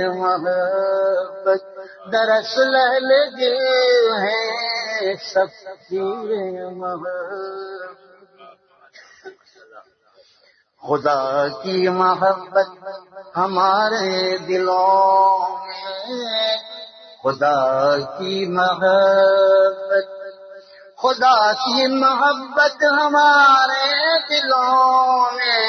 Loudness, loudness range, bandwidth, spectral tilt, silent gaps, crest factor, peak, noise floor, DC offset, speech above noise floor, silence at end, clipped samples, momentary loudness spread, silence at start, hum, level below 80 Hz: -17 LUFS; 13 LU; 6.6 kHz; -4 dB/octave; none; 14 dB; -4 dBFS; -57 dBFS; under 0.1%; 40 dB; 0 s; under 0.1%; 15 LU; 0 s; none; -72 dBFS